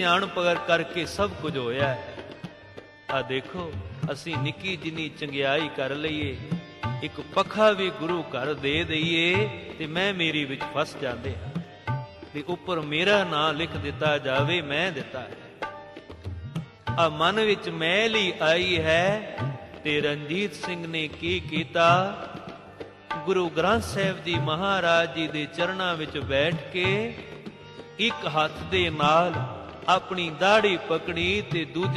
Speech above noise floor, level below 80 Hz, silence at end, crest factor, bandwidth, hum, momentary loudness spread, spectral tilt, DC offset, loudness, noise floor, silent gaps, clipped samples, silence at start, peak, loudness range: 21 dB; -54 dBFS; 0 s; 20 dB; 13 kHz; none; 15 LU; -5 dB/octave; under 0.1%; -26 LUFS; -47 dBFS; none; under 0.1%; 0 s; -6 dBFS; 5 LU